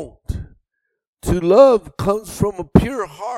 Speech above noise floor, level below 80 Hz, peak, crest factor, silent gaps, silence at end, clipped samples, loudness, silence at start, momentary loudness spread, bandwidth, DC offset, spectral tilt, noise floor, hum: 58 dB; -34 dBFS; 0 dBFS; 18 dB; 1.07-1.13 s; 0 s; under 0.1%; -16 LUFS; 0 s; 19 LU; 15 kHz; under 0.1%; -7 dB/octave; -74 dBFS; none